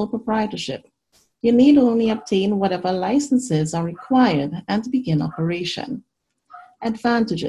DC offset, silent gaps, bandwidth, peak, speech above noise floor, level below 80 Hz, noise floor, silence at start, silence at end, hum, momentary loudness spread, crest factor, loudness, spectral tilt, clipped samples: under 0.1%; none; 11.5 kHz; -4 dBFS; 43 dB; -56 dBFS; -63 dBFS; 0 s; 0 s; none; 13 LU; 16 dB; -20 LUFS; -6 dB/octave; under 0.1%